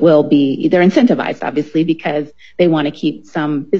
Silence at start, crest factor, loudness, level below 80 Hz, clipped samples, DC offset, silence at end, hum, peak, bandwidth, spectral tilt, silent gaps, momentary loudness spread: 0 s; 14 dB; -15 LUFS; -58 dBFS; under 0.1%; 0.7%; 0 s; none; 0 dBFS; 7.2 kHz; -7.5 dB/octave; none; 10 LU